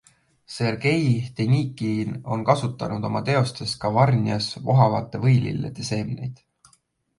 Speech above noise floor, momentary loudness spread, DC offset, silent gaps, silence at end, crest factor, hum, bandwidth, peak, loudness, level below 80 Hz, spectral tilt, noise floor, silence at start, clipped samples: 41 dB; 9 LU; under 0.1%; none; 0.85 s; 20 dB; none; 11.5 kHz; -2 dBFS; -23 LUFS; -54 dBFS; -6.5 dB/octave; -63 dBFS; 0.5 s; under 0.1%